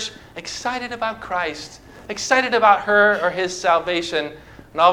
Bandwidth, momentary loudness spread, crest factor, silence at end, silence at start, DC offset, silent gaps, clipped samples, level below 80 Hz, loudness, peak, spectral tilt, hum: 15.5 kHz; 17 LU; 20 dB; 0 s; 0 s; under 0.1%; none; under 0.1%; -52 dBFS; -19 LUFS; 0 dBFS; -2.5 dB/octave; none